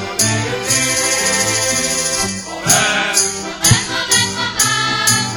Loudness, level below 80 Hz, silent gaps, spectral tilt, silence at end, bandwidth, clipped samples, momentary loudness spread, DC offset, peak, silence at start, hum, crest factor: -14 LUFS; -42 dBFS; none; -1.5 dB/octave; 0 s; over 20 kHz; under 0.1%; 5 LU; under 0.1%; 0 dBFS; 0 s; none; 16 dB